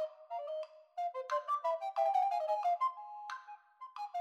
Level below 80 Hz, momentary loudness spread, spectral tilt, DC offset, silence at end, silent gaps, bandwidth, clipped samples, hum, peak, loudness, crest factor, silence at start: under -90 dBFS; 14 LU; 2.5 dB/octave; under 0.1%; 0 s; none; 12.5 kHz; under 0.1%; none; -22 dBFS; -37 LUFS; 16 dB; 0 s